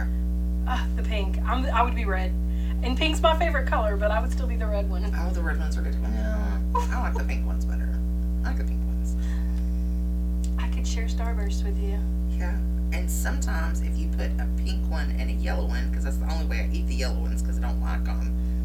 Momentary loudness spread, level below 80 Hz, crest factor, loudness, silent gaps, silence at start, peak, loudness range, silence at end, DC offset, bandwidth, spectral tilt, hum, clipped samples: 4 LU; -26 dBFS; 18 dB; -27 LUFS; none; 0 s; -8 dBFS; 3 LU; 0 s; under 0.1%; 14 kHz; -6 dB/octave; 60 Hz at -25 dBFS; under 0.1%